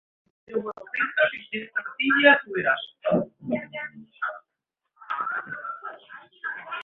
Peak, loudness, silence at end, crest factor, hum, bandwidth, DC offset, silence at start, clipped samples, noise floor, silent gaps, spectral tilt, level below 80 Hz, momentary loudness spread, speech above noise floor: -2 dBFS; -25 LUFS; 0 s; 24 dB; none; 4.3 kHz; under 0.1%; 0.5 s; under 0.1%; -83 dBFS; none; -7.5 dB/octave; -72 dBFS; 18 LU; 57 dB